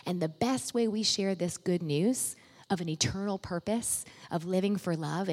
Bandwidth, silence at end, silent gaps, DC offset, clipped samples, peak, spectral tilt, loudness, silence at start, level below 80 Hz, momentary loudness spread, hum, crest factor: 16 kHz; 0 s; none; under 0.1%; under 0.1%; -14 dBFS; -4.5 dB/octave; -31 LUFS; 0.05 s; -62 dBFS; 7 LU; none; 18 dB